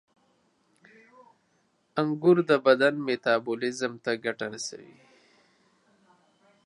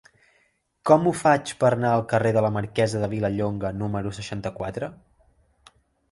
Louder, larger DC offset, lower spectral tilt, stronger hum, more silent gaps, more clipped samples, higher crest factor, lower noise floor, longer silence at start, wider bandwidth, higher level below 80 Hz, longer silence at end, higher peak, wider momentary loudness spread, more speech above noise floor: about the same, -26 LUFS vs -24 LUFS; neither; second, -5 dB/octave vs -6.5 dB/octave; neither; neither; neither; about the same, 22 dB vs 20 dB; about the same, -70 dBFS vs -67 dBFS; first, 1.95 s vs 0.85 s; about the same, 11 kHz vs 11.5 kHz; second, -80 dBFS vs -52 dBFS; first, 1.8 s vs 1.15 s; about the same, -6 dBFS vs -4 dBFS; about the same, 13 LU vs 12 LU; about the same, 44 dB vs 44 dB